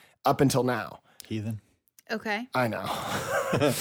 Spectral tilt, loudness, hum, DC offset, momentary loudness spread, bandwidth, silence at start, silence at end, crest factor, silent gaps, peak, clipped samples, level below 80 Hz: -5 dB/octave; -28 LUFS; none; under 0.1%; 13 LU; 20 kHz; 0.25 s; 0 s; 18 dB; none; -10 dBFS; under 0.1%; -60 dBFS